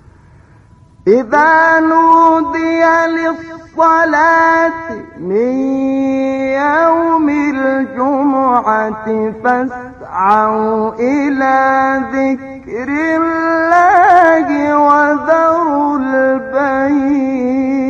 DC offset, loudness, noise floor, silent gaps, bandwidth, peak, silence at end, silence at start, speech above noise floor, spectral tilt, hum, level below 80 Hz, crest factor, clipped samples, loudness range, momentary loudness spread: under 0.1%; -12 LUFS; -43 dBFS; none; 7.4 kHz; 0 dBFS; 0 s; 1.05 s; 31 dB; -6 dB/octave; none; -48 dBFS; 12 dB; under 0.1%; 4 LU; 9 LU